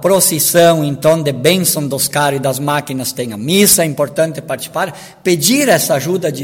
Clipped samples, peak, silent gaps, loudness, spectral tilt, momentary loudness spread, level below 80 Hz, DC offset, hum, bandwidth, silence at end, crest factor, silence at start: under 0.1%; 0 dBFS; none; -13 LUFS; -3.5 dB/octave; 11 LU; -52 dBFS; under 0.1%; none; 19 kHz; 0 s; 14 dB; 0 s